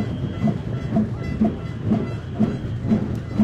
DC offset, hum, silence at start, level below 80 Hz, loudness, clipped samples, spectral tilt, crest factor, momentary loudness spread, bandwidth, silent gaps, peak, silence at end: under 0.1%; none; 0 s; -38 dBFS; -24 LUFS; under 0.1%; -9 dB/octave; 16 dB; 4 LU; 8 kHz; none; -8 dBFS; 0 s